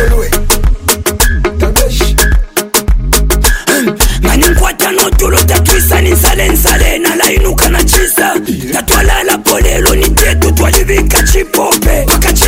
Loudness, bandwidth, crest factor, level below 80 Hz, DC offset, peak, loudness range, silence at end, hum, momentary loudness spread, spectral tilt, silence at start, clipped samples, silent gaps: -9 LUFS; 17 kHz; 8 dB; -12 dBFS; under 0.1%; 0 dBFS; 2 LU; 0 s; none; 4 LU; -3.5 dB/octave; 0 s; 0.3%; none